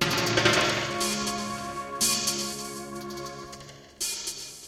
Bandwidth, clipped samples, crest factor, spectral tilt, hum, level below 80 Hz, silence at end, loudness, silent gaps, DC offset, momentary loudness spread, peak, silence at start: 16.5 kHz; under 0.1%; 20 dB; -2 dB/octave; none; -54 dBFS; 0 s; -27 LUFS; none; under 0.1%; 17 LU; -8 dBFS; 0 s